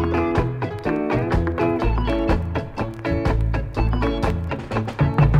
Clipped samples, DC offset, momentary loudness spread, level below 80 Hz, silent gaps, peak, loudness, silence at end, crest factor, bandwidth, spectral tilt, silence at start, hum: under 0.1%; under 0.1%; 5 LU; -26 dBFS; none; -4 dBFS; -23 LUFS; 0 s; 16 dB; 9 kHz; -8.5 dB/octave; 0 s; none